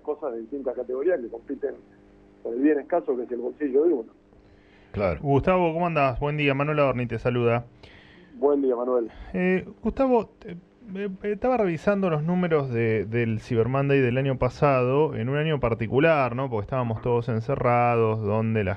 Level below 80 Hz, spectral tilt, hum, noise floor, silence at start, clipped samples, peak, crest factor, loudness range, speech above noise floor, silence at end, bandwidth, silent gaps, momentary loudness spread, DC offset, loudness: -48 dBFS; -9 dB/octave; none; -54 dBFS; 0.05 s; under 0.1%; -8 dBFS; 16 dB; 4 LU; 30 dB; 0 s; 7.6 kHz; none; 10 LU; under 0.1%; -25 LUFS